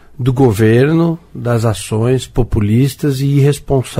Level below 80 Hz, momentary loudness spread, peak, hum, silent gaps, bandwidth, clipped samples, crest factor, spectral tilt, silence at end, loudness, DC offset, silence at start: -30 dBFS; 7 LU; 0 dBFS; none; none; 16 kHz; under 0.1%; 12 dB; -7 dB/octave; 0 s; -14 LUFS; under 0.1%; 0.2 s